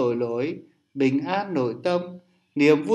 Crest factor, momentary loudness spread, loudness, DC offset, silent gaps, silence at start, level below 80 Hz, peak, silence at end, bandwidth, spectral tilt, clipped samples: 18 dB; 18 LU; -24 LUFS; under 0.1%; none; 0 s; -74 dBFS; -6 dBFS; 0 s; 9.4 kHz; -7 dB/octave; under 0.1%